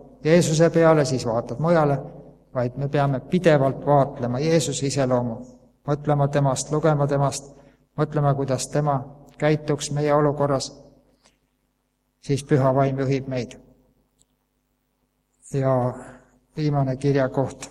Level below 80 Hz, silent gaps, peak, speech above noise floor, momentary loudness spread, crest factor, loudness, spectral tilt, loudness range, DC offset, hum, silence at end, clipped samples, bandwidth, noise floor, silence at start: -52 dBFS; none; -2 dBFS; 50 dB; 12 LU; 20 dB; -22 LUFS; -6 dB/octave; 6 LU; under 0.1%; none; 0 s; under 0.1%; 12.5 kHz; -71 dBFS; 0.2 s